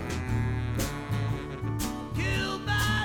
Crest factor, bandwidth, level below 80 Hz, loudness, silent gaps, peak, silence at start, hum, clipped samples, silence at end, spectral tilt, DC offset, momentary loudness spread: 14 dB; 18.5 kHz; -38 dBFS; -30 LUFS; none; -16 dBFS; 0 s; none; under 0.1%; 0 s; -5 dB/octave; under 0.1%; 5 LU